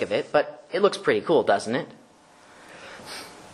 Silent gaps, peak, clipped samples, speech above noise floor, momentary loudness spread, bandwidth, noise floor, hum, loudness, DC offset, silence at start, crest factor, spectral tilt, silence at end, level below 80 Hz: none; -6 dBFS; under 0.1%; 30 dB; 20 LU; 13 kHz; -53 dBFS; none; -24 LUFS; under 0.1%; 0 s; 20 dB; -4.5 dB/octave; 0 s; -68 dBFS